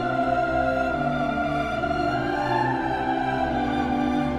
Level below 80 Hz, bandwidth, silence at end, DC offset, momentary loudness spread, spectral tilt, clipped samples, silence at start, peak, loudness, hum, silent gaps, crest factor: -42 dBFS; 11.5 kHz; 0 s; under 0.1%; 2 LU; -7 dB/octave; under 0.1%; 0 s; -10 dBFS; -24 LUFS; none; none; 14 dB